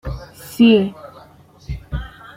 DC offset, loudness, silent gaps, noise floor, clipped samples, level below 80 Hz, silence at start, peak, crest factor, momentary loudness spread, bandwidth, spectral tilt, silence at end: under 0.1%; -16 LUFS; none; -46 dBFS; under 0.1%; -34 dBFS; 0.05 s; -2 dBFS; 18 dB; 21 LU; 16 kHz; -6.5 dB/octave; 0.3 s